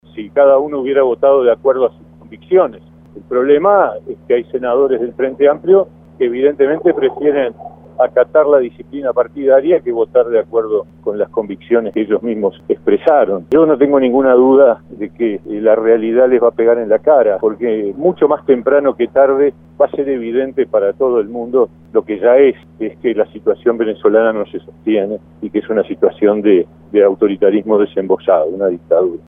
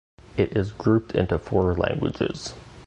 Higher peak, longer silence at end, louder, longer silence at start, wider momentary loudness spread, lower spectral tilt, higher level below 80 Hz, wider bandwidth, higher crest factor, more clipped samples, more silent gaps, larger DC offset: first, 0 dBFS vs -6 dBFS; about the same, 0.1 s vs 0.05 s; first, -13 LUFS vs -25 LUFS; second, 0.15 s vs 0.35 s; about the same, 9 LU vs 9 LU; first, -9.5 dB/octave vs -7 dB/octave; second, -52 dBFS vs -40 dBFS; second, 3.7 kHz vs 9.4 kHz; about the same, 14 dB vs 18 dB; neither; neither; neither